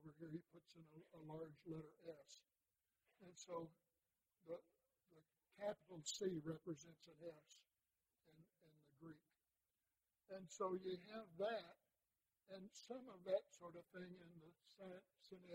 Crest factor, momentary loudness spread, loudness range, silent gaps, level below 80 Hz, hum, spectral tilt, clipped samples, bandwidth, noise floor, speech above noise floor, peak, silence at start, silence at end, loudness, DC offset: 24 dB; 19 LU; 9 LU; none; under -90 dBFS; none; -4.5 dB/octave; under 0.1%; 16 kHz; under -90 dBFS; over 37 dB; -32 dBFS; 0 s; 0 s; -53 LUFS; under 0.1%